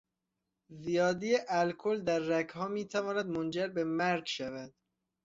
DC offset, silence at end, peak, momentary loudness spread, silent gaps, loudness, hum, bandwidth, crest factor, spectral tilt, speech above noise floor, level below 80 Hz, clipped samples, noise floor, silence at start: under 0.1%; 0.55 s; -18 dBFS; 8 LU; none; -33 LUFS; none; 7.8 kHz; 16 dB; -5 dB/octave; 54 dB; -72 dBFS; under 0.1%; -86 dBFS; 0.7 s